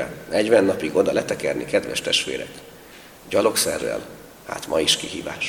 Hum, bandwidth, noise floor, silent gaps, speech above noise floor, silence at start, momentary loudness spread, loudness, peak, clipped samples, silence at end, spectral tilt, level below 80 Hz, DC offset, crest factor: none; 19 kHz; -44 dBFS; none; 22 dB; 0 s; 15 LU; -21 LUFS; -2 dBFS; under 0.1%; 0 s; -2.5 dB/octave; -54 dBFS; under 0.1%; 20 dB